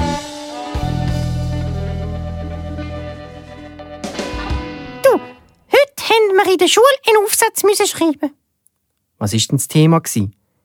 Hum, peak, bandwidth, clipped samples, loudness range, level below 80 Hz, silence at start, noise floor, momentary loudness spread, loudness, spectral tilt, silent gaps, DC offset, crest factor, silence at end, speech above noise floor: none; 0 dBFS; 19.5 kHz; under 0.1%; 12 LU; -32 dBFS; 0 s; -69 dBFS; 17 LU; -16 LUFS; -4.5 dB/octave; none; under 0.1%; 16 dB; 0.35 s; 55 dB